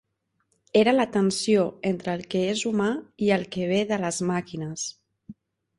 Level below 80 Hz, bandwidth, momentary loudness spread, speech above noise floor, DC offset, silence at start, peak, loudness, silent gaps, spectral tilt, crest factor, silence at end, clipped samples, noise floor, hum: -64 dBFS; 11.5 kHz; 9 LU; 49 dB; under 0.1%; 0.75 s; -8 dBFS; -25 LUFS; none; -5 dB/octave; 18 dB; 0.45 s; under 0.1%; -73 dBFS; none